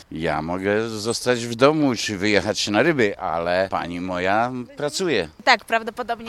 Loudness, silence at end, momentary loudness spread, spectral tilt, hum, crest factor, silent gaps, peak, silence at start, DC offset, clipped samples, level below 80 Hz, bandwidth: -21 LUFS; 0 s; 8 LU; -4 dB/octave; none; 22 dB; none; 0 dBFS; 0.1 s; under 0.1%; under 0.1%; -52 dBFS; 15 kHz